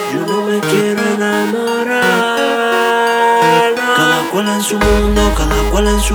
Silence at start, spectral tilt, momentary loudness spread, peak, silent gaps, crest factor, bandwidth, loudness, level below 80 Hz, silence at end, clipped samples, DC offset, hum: 0 s; -4 dB/octave; 5 LU; 0 dBFS; none; 12 dB; over 20 kHz; -13 LUFS; -22 dBFS; 0 s; under 0.1%; under 0.1%; none